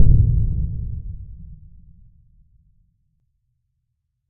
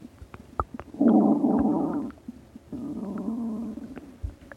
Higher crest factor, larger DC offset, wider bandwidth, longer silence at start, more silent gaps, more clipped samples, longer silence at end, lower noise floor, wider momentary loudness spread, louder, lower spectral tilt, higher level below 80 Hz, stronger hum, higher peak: about the same, 20 dB vs 18 dB; neither; second, 0.9 kHz vs 7.4 kHz; about the same, 0 s vs 0 s; neither; neither; first, 2.75 s vs 0 s; first, -74 dBFS vs -47 dBFS; first, 25 LU vs 22 LU; first, -22 LUFS vs -26 LUFS; first, -17 dB/octave vs -9.5 dB/octave; first, -26 dBFS vs -48 dBFS; neither; first, 0 dBFS vs -8 dBFS